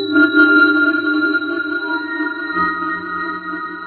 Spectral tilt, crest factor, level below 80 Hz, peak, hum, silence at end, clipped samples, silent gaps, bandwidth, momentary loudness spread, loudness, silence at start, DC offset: -7 dB/octave; 16 dB; -60 dBFS; 0 dBFS; none; 0 s; under 0.1%; none; 4.5 kHz; 12 LU; -16 LUFS; 0 s; under 0.1%